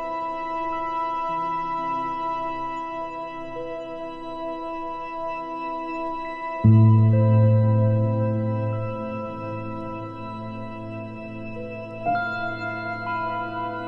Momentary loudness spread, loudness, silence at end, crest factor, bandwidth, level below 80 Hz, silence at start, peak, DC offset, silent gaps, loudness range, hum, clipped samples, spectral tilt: 16 LU; -25 LUFS; 0 s; 18 dB; 5.2 kHz; -50 dBFS; 0 s; -6 dBFS; under 0.1%; none; 11 LU; none; under 0.1%; -10 dB/octave